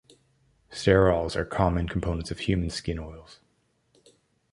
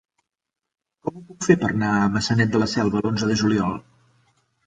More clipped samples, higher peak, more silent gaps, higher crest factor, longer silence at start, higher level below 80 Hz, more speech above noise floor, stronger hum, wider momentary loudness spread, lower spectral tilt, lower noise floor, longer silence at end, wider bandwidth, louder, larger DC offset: neither; about the same, -4 dBFS vs -4 dBFS; neither; about the same, 24 dB vs 20 dB; second, 0.7 s vs 1.05 s; first, -40 dBFS vs -50 dBFS; second, 44 dB vs 64 dB; neither; first, 17 LU vs 13 LU; about the same, -6.5 dB/octave vs -5.5 dB/octave; second, -70 dBFS vs -85 dBFS; first, 1.2 s vs 0.85 s; first, 11.5 kHz vs 9.4 kHz; second, -26 LUFS vs -21 LUFS; neither